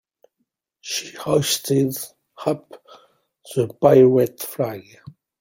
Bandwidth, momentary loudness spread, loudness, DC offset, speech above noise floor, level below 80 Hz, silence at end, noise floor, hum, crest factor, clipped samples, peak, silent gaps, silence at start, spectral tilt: 17 kHz; 17 LU; -20 LUFS; under 0.1%; 55 dB; -60 dBFS; 0.3 s; -75 dBFS; none; 20 dB; under 0.1%; -2 dBFS; none; 0.85 s; -5 dB/octave